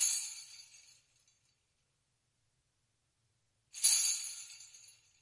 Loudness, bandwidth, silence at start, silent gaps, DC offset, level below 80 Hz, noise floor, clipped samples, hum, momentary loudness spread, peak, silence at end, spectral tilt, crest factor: -31 LUFS; 11.5 kHz; 0 s; none; under 0.1%; under -90 dBFS; -80 dBFS; under 0.1%; none; 25 LU; -14 dBFS; 0.45 s; 5.5 dB/octave; 26 dB